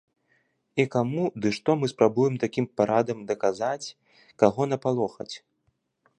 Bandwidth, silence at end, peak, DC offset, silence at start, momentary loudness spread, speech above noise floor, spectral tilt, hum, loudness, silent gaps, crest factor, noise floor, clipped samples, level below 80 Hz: 10 kHz; 0.8 s; -4 dBFS; under 0.1%; 0.75 s; 10 LU; 48 dB; -6.5 dB/octave; none; -26 LUFS; none; 22 dB; -73 dBFS; under 0.1%; -66 dBFS